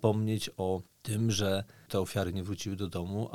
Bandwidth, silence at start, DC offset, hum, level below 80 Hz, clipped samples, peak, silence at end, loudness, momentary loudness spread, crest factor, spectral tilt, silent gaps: 16 kHz; 0 s; 0.1%; none; -60 dBFS; under 0.1%; -12 dBFS; 0 s; -33 LUFS; 7 LU; 20 dB; -5.5 dB/octave; none